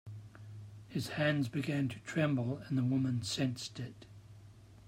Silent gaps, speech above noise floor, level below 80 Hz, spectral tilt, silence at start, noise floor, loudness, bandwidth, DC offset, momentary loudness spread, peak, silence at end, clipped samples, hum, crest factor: none; 22 dB; -68 dBFS; -6 dB/octave; 0.05 s; -56 dBFS; -35 LUFS; 16 kHz; under 0.1%; 19 LU; -20 dBFS; 0 s; under 0.1%; none; 16 dB